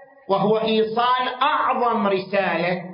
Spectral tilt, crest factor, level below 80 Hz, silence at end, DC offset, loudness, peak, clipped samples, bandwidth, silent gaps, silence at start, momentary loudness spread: -10 dB/octave; 16 dB; -64 dBFS; 0 s; under 0.1%; -20 LUFS; -6 dBFS; under 0.1%; 5.4 kHz; none; 0 s; 3 LU